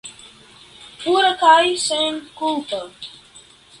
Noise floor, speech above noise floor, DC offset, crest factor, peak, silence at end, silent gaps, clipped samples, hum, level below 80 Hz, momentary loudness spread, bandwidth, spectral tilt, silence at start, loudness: -47 dBFS; 29 dB; under 0.1%; 20 dB; 0 dBFS; 0.7 s; none; under 0.1%; none; -62 dBFS; 22 LU; 11.5 kHz; -1 dB/octave; 0.05 s; -18 LUFS